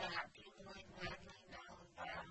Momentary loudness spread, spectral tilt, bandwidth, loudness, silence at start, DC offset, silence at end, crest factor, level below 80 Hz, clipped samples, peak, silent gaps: 11 LU; -3.5 dB/octave; 8.2 kHz; -52 LUFS; 0 s; under 0.1%; 0 s; 22 dB; -68 dBFS; under 0.1%; -30 dBFS; none